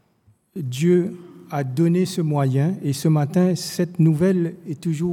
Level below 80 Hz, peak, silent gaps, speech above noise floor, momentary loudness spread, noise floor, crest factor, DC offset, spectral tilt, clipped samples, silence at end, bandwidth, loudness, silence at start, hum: -64 dBFS; -8 dBFS; none; 40 dB; 11 LU; -60 dBFS; 14 dB; under 0.1%; -7 dB/octave; under 0.1%; 0 s; 16 kHz; -21 LUFS; 0.55 s; none